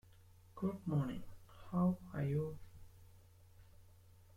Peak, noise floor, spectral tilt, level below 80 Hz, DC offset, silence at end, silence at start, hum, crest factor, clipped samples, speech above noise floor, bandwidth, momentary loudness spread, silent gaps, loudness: -26 dBFS; -63 dBFS; -9.5 dB/octave; -64 dBFS; under 0.1%; 0.25 s; 0.2 s; none; 18 dB; under 0.1%; 25 dB; 15.5 kHz; 24 LU; none; -40 LUFS